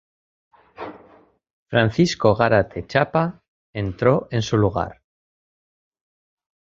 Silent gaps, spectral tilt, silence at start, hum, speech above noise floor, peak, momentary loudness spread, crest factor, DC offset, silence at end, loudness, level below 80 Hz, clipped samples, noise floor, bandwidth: 1.53-1.66 s, 3.48-3.73 s; -6.5 dB/octave; 0.8 s; none; 34 dB; -2 dBFS; 18 LU; 22 dB; under 0.1%; 1.7 s; -20 LUFS; -46 dBFS; under 0.1%; -53 dBFS; 7.8 kHz